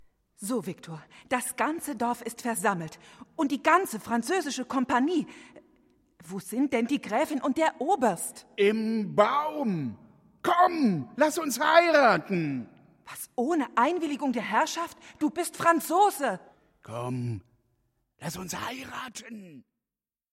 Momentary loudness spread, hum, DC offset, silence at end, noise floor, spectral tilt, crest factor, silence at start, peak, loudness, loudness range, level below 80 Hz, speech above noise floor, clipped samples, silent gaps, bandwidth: 17 LU; none; under 0.1%; 0.7 s; under -90 dBFS; -4.5 dB/octave; 22 dB; 0.4 s; -6 dBFS; -27 LUFS; 7 LU; -70 dBFS; over 63 dB; under 0.1%; none; 16 kHz